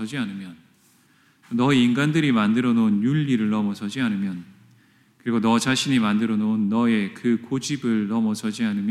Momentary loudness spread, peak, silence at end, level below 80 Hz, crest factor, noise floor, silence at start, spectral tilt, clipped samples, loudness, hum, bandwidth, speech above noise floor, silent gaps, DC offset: 9 LU; -6 dBFS; 0 s; -68 dBFS; 16 dB; -59 dBFS; 0 s; -5.5 dB/octave; under 0.1%; -22 LUFS; none; 12.5 kHz; 37 dB; none; under 0.1%